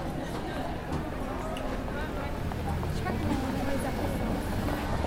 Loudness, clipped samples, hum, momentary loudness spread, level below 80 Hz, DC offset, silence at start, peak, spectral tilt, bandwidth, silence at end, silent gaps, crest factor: -33 LUFS; under 0.1%; none; 4 LU; -38 dBFS; under 0.1%; 0 s; -14 dBFS; -6.5 dB/octave; 16 kHz; 0 s; none; 16 dB